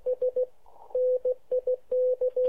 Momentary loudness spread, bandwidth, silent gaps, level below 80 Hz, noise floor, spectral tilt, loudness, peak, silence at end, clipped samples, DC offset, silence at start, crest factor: 6 LU; 1.3 kHz; none; -66 dBFS; -52 dBFS; -6.5 dB/octave; -28 LUFS; -20 dBFS; 0 s; under 0.1%; 0.3%; 0.05 s; 8 dB